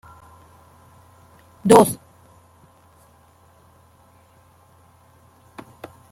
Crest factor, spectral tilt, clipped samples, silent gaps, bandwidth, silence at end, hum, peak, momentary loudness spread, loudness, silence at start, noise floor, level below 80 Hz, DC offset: 24 dB; -5.5 dB/octave; under 0.1%; none; 16.5 kHz; 4.15 s; none; 0 dBFS; 30 LU; -16 LUFS; 1.65 s; -54 dBFS; -58 dBFS; under 0.1%